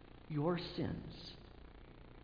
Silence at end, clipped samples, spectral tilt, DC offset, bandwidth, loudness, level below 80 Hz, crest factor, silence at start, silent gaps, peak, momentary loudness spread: 0 s; under 0.1%; -6 dB/octave; under 0.1%; 5.2 kHz; -42 LUFS; -60 dBFS; 20 dB; 0 s; none; -24 dBFS; 21 LU